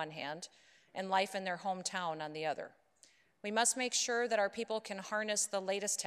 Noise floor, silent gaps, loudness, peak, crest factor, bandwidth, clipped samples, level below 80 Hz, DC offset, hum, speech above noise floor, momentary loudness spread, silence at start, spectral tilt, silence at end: -68 dBFS; none; -36 LUFS; -18 dBFS; 20 dB; 13.5 kHz; under 0.1%; -86 dBFS; under 0.1%; none; 31 dB; 12 LU; 0 s; -1.5 dB/octave; 0 s